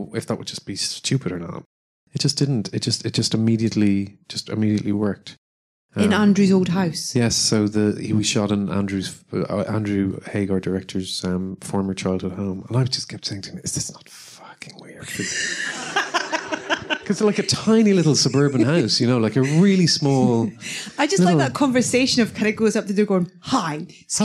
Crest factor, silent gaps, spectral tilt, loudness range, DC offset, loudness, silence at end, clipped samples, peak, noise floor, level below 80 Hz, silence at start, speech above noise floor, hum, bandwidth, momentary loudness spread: 14 dB; 1.66-2.07 s, 5.38-5.89 s; -5 dB/octave; 8 LU; under 0.1%; -21 LUFS; 0 s; under 0.1%; -6 dBFS; under -90 dBFS; -58 dBFS; 0 s; over 70 dB; none; 13 kHz; 12 LU